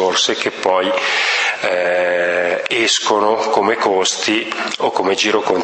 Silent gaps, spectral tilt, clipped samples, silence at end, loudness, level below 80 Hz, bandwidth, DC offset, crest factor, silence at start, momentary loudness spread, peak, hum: none; -1.5 dB/octave; under 0.1%; 0 s; -16 LUFS; -66 dBFS; 8.8 kHz; under 0.1%; 16 dB; 0 s; 3 LU; 0 dBFS; none